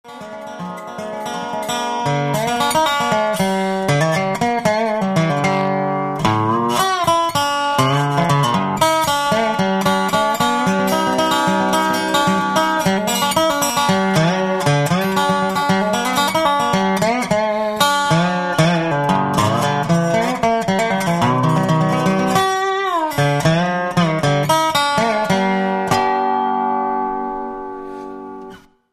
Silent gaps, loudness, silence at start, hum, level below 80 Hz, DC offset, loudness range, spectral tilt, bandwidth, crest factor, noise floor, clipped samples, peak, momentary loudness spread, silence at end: none; -17 LUFS; 0.05 s; none; -48 dBFS; under 0.1%; 2 LU; -5 dB/octave; 15 kHz; 16 dB; -39 dBFS; under 0.1%; 0 dBFS; 6 LU; 0.35 s